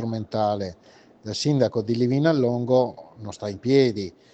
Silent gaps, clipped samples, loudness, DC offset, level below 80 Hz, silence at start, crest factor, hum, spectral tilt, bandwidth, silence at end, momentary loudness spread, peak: none; under 0.1%; -23 LUFS; under 0.1%; -64 dBFS; 0 s; 18 dB; none; -6.5 dB/octave; 8.8 kHz; 0.25 s; 14 LU; -6 dBFS